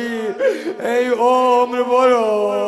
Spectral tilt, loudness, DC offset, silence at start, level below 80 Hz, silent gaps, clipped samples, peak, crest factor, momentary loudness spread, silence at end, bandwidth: -4 dB/octave; -16 LUFS; under 0.1%; 0 s; -64 dBFS; none; under 0.1%; -2 dBFS; 14 dB; 6 LU; 0 s; 12.5 kHz